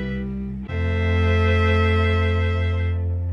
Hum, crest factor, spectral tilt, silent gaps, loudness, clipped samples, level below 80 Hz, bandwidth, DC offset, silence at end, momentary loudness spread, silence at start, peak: none; 12 dB; -8 dB/octave; none; -21 LUFS; under 0.1%; -30 dBFS; 5.6 kHz; under 0.1%; 0 s; 10 LU; 0 s; -8 dBFS